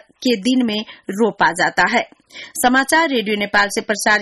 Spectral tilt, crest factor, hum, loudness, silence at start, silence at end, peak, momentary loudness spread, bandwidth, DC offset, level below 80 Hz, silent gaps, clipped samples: -3 dB/octave; 14 dB; none; -17 LUFS; 0.2 s; 0 s; -4 dBFS; 10 LU; 12.5 kHz; under 0.1%; -54 dBFS; none; under 0.1%